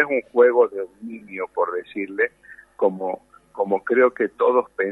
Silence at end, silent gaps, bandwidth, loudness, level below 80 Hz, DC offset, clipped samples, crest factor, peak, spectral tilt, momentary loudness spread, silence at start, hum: 0 s; none; 4.1 kHz; -21 LUFS; -68 dBFS; under 0.1%; under 0.1%; 18 dB; -4 dBFS; -7.5 dB/octave; 16 LU; 0 s; none